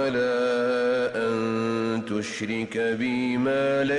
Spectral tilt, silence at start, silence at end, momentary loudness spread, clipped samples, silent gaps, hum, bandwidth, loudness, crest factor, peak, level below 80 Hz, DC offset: -5.5 dB/octave; 0 s; 0 s; 5 LU; under 0.1%; none; none; 11 kHz; -25 LUFS; 10 dB; -16 dBFS; -64 dBFS; under 0.1%